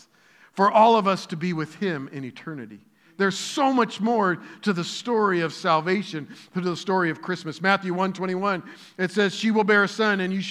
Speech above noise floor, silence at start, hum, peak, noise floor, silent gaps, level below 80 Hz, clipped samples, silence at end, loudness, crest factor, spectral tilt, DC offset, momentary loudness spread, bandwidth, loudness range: 33 dB; 0.55 s; none; -4 dBFS; -56 dBFS; none; -86 dBFS; under 0.1%; 0 s; -23 LUFS; 20 dB; -5 dB/octave; under 0.1%; 15 LU; 12.5 kHz; 3 LU